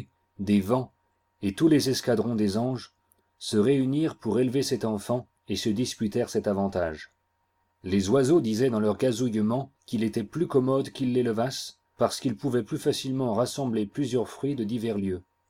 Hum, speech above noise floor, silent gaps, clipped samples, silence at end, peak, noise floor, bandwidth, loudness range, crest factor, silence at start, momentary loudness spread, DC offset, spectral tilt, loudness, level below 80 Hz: none; 47 dB; none; under 0.1%; 0.3 s; -8 dBFS; -73 dBFS; 16 kHz; 3 LU; 18 dB; 0 s; 9 LU; under 0.1%; -6 dB/octave; -27 LUFS; -62 dBFS